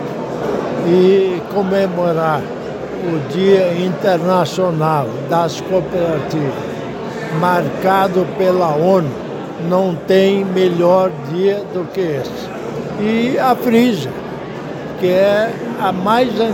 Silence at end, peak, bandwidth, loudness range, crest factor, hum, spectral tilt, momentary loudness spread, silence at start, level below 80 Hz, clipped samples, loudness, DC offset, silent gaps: 0 s; -2 dBFS; 17 kHz; 3 LU; 14 dB; none; -6.5 dB/octave; 12 LU; 0 s; -50 dBFS; under 0.1%; -16 LUFS; under 0.1%; none